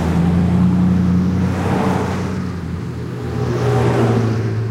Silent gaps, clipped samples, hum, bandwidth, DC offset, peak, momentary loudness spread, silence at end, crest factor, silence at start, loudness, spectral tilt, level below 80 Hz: none; under 0.1%; none; 12 kHz; under 0.1%; -4 dBFS; 10 LU; 0 s; 12 dB; 0 s; -17 LUFS; -8 dB/octave; -36 dBFS